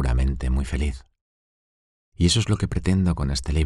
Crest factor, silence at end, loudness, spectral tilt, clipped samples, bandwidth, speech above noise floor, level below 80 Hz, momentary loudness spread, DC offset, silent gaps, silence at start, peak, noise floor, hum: 16 dB; 0 s; -23 LUFS; -5.5 dB/octave; under 0.1%; 12 kHz; over 68 dB; -28 dBFS; 7 LU; under 0.1%; 1.21-2.12 s; 0 s; -6 dBFS; under -90 dBFS; none